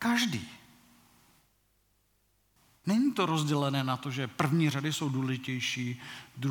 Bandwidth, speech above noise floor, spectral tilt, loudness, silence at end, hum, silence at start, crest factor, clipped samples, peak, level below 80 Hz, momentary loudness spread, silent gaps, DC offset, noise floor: 19 kHz; 41 dB; -5 dB/octave; -31 LUFS; 0 s; 50 Hz at -65 dBFS; 0 s; 22 dB; under 0.1%; -10 dBFS; -74 dBFS; 11 LU; none; under 0.1%; -71 dBFS